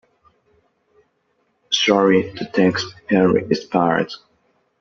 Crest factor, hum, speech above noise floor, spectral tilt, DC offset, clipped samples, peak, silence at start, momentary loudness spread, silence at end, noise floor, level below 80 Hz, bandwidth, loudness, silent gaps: 20 dB; none; 49 dB; -3.5 dB/octave; under 0.1%; under 0.1%; 0 dBFS; 1.7 s; 9 LU; 0.65 s; -67 dBFS; -58 dBFS; 7.6 kHz; -18 LUFS; none